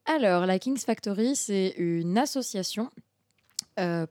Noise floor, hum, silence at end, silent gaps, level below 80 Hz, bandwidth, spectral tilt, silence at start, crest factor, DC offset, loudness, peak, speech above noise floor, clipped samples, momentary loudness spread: -70 dBFS; none; 0.05 s; none; -82 dBFS; 17.5 kHz; -4.5 dB/octave; 0.05 s; 18 dB; under 0.1%; -28 LUFS; -10 dBFS; 43 dB; under 0.1%; 11 LU